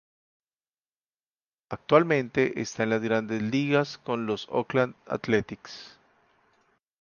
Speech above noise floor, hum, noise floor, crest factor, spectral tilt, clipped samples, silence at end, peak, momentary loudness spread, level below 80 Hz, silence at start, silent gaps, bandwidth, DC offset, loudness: over 64 dB; none; under -90 dBFS; 24 dB; -6 dB/octave; under 0.1%; 1.1 s; -4 dBFS; 17 LU; -64 dBFS; 1.7 s; none; 7.2 kHz; under 0.1%; -26 LUFS